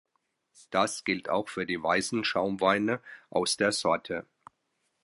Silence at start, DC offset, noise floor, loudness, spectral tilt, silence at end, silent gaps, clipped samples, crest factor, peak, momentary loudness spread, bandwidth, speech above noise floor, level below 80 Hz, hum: 0.7 s; under 0.1%; -77 dBFS; -29 LUFS; -3.5 dB/octave; 0.8 s; none; under 0.1%; 20 dB; -10 dBFS; 7 LU; 11.5 kHz; 49 dB; -66 dBFS; none